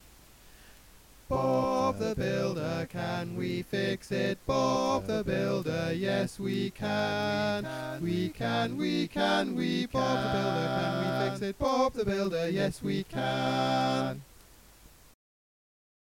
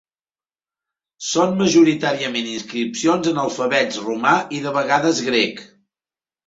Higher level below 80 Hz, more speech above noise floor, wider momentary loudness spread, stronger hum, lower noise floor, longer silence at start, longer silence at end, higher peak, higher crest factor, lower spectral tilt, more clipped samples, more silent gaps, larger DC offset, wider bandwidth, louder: first, -54 dBFS vs -62 dBFS; second, 26 dB vs over 71 dB; second, 6 LU vs 10 LU; neither; second, -56 dBFS vs under -90 dBFS; second, 0.45 s vs 1.2 s; first, 1.9 s vs 0.8 s; second, -14 dBFS vs -2 dBFS; about the same, 16 dB vs 18 dB; first, -6 dB/octave vs -4 dB/octave; neither; neither; neither; first, 17 kHz vs 8 kHz; second, -30 LUFS vs -19 LUFS